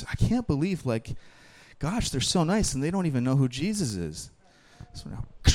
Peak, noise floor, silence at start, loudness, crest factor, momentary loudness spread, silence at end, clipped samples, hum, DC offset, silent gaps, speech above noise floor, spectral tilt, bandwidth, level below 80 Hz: -4 dBFS; -50 dBFS; 0 s; -27 LUFS; 22 dB; 17 LU; 0 s; under 0.1%; none; under 0.1%; none; 23 dB; -5 dB/octave; 16 kHz; -36 dBFS